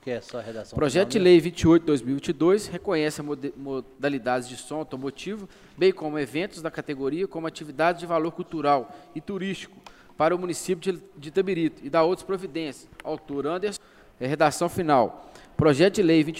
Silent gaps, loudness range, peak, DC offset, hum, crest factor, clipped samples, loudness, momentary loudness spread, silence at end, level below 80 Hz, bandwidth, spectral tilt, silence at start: none; 6 LU; -6 dBFS; under 0.1%; none; 20 dB; under 0.1%; -25 LUFS; 15 LU; 0 s; -56 dBFS; 15.5 kHz; -5.5 dB/octave; 0.05 s